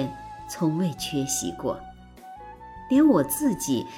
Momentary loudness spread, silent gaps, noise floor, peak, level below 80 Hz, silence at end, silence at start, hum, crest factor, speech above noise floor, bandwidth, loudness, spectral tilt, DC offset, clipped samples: 23 LU; none; -45 dBFS; -8 dBFS; -52 dBFS; 0 s; 0 s; none; 18 dB; 21 dB; 17 kHz; -24 LUFS; -5 dB/octave; under 0.1%; under 0.1%